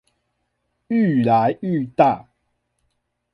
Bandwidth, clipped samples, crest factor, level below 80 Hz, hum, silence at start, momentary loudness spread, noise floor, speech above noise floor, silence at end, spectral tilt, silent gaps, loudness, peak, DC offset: 5.8 kHz; under 0.1%; 18 dB; -60 dBFS; 60 Hz at -45 dBFS; 0.9 s; 7 LU; -73 dBFS; 55 dB; 1.1 s; -9.5 dB/octave; none; -19 LUFS; -2 dBFS; under 0.1%